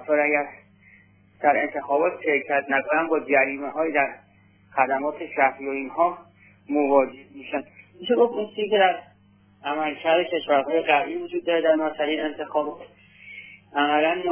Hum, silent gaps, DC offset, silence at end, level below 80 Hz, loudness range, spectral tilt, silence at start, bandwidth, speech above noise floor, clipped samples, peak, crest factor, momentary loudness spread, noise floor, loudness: none; none; under 0.1%; 0 s; -70 dBFS; 2 LU; -7.5 dB/octave; 0 s; 3.5 kHz; 34 dB; under 0.1%; -6 dBFS; 18 dB; 11 LU; -57 dBFS; -23 LUFS